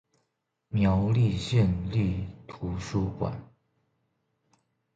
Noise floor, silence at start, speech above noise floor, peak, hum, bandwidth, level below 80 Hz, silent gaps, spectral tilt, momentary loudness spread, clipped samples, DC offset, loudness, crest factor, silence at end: -79 dBFS; 0.7 s; 53 dB; -12 dBFS; none; 8.6 kHz; -44 dBFS; none; -7.5 dB/octave; 12 LU; under 0.1%; under 0.1%; -28 LUFS; 18 dB; 1.5 s